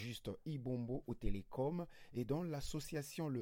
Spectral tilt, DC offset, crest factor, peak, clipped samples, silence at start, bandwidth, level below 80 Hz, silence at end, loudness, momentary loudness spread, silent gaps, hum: -6.5 dB/octave; under 0.1%; 18 dB; -24 dBFS; under 0.1%; 0 s; 16.5 kHz; -52 dBFS; 0 s; -44 LUFS; 5 LU; none; none